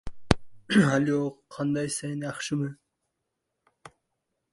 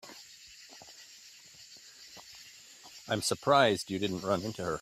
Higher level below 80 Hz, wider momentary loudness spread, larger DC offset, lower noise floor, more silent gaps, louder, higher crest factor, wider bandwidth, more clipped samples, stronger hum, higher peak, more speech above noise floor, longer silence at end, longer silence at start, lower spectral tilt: first, -48 dBFS vs -68 dBFS; second, 11 LU vs 25 LU; neither; first, -82 dBFS vs -54 dBFS; neither; first, -27 LUFS vs -30 LUFS; about the same, 28 dB vs 24 dB; second, 11.5 kHz vs 15.5 kHz; neither; neither; first, 0 dBFS vs -10 dBFS; first, 55 dB vs 25 dB; first, 0.65 s vs 0 s; about the same, 0.05 s vs 0.05 s; first, -5.5 dB/octave vs -4 dB/octave